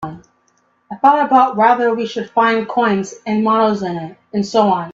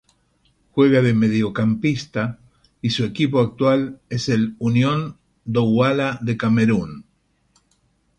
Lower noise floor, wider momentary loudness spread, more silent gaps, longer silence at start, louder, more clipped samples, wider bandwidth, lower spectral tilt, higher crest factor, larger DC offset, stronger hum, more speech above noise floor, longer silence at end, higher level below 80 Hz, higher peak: second, -60 dBFS vs -64 dBFS; about the same, 12 LU vs 10 LU; neither; second, 0 s vs 0.75 s; first, -15 LUFS vs -20 LUFS; neither; second, 7.8 kHz vs 9.2 kHz; about the same, -6 dB/octave vs -7 dB/octave; about the same, 16 dB vs 16 dB; neither; neither; about the same, 45 dB vs 45 dB; second, 0 s vs 1.15 s; second, -60 dBFS vs -52 dBFS; first, 0 dBFS vs -4 dBFS